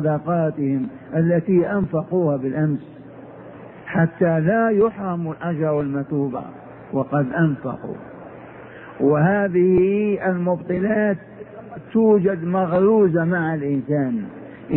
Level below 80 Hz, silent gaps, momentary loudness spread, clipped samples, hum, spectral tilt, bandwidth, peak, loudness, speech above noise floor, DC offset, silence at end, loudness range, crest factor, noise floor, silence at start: -54 dBFS; none; 22 LU; under 0.1%; none; -13.5 dB/octave; 3.6 kHz; -6 dBFS; -20 LUFS; 20 dB; under 0.1%; 0 s; 4 LU; 16 dB; -39 dBFS; 0 s